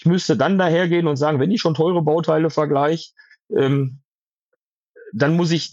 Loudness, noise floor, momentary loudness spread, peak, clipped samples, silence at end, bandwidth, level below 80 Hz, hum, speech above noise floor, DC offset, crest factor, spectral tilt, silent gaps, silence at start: -19 LUFS; -77 dBFS; 7 LU; -4 dBFS; under 0.1%; 0.05 s; 7.8 kHz; -72 dBFS; none; 59 dB; under 0.1%; 16 dB; -6.5 dB/octave; 4.05-4.94 s; 0.05 s